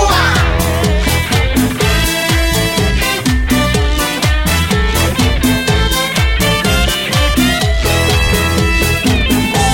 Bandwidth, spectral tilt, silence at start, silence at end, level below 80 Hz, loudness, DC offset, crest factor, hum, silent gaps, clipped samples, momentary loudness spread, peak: 17 kHz; -4 dB/octave; 0 s; 0 s; -18 dBFS; -12 LUFS; under 0.1%; 12 dB; none; none; under 0.1%; 2 LU; 0 dBFS